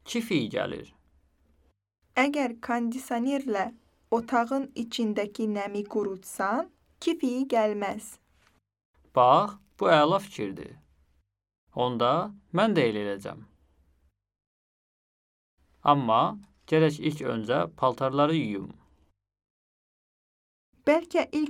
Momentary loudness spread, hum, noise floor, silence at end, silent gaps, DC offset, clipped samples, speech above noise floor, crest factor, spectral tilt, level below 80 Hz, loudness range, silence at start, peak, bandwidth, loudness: 13 LU; none; -71 dBFS; 0 s; 8.85-8.93 s, 11.58-11.67 s, 14.47-15.57 s, 19.50-20.73 s; under 0.1%; under 0.1%; 44 dB; 22 dB; -6 dB/octave; -66 dBFS; 5 LU; 0.05 s; -6 dBFS; 17 kHz; -27 LUFS